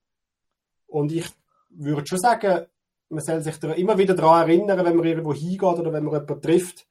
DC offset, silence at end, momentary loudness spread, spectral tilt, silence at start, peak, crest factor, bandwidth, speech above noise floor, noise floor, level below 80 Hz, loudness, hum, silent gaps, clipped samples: under 0.1%; 0.1 s; 12 LU; -6.5 dB/octave; 0.9 s; -2 dBFS; 20 dB; 15.5 kHz; 61 dB; -81 dBFS; -64 dBFS; -22 LUFS; none; none; under 0.1%